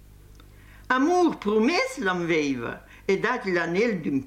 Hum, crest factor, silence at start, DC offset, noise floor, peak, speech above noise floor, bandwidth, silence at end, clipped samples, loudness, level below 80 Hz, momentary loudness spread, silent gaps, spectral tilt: none; 16 dB; 0.3 s; under 0.1%; -49 dBFS; -8 dBFS; 25 dB; 15 kHz; 0 s; under 0.1%; -24 LUFS; -54 dBFS; 6 LU; none; -5.5 dB/octave